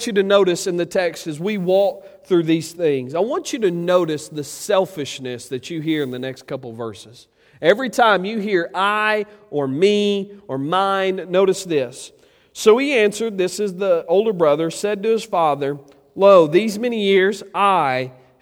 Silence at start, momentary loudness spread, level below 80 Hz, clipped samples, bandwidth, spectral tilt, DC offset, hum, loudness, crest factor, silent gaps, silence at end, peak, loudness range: 0 s; 13 LU; -66 dBFS; under 0.1%; 17 kHz; -5 dB/octave; under 0.1%; none; -19 LUFS; 18 dB; none; 0.3 s; 0 dBFS; 5 LU